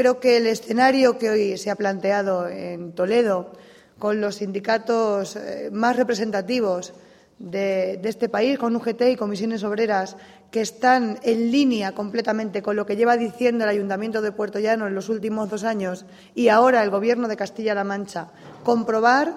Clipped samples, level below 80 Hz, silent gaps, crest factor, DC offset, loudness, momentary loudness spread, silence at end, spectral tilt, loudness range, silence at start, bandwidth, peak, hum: under 0.1%; -68 dBFS; none; 18 dB; under 0.1%; -22 LUFS; 11 LU; 0 s; -5 dB/octave; 3 LU; 0 s; 14 kHz; -4 dBFS; none